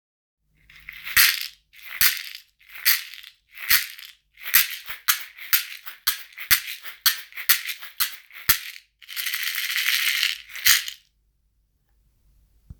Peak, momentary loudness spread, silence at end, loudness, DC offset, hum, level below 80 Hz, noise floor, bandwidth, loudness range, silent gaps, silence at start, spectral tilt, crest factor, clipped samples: 0 dBFS; 18 LU; 1.85 s; -21 LUFS; under 0.1%; none; -56 dBFS; -68 dBFS; over 20 kHz; 2 LU; none; 0.9 s; 3 dB/octave; 26 dB; under 0.1%